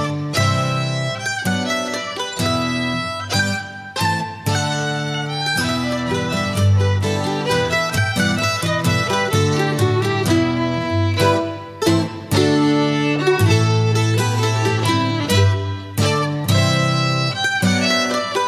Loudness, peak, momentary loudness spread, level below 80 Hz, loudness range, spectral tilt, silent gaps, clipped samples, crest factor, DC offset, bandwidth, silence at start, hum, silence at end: -18 LUFS; -4 dBFS; 6 LU; -38 dBFS; 4 LU; -5 dB/octave; none; under 0.1%; 14 dB; under 0.1%; 15.5 kHz; 0 s; none; 0 s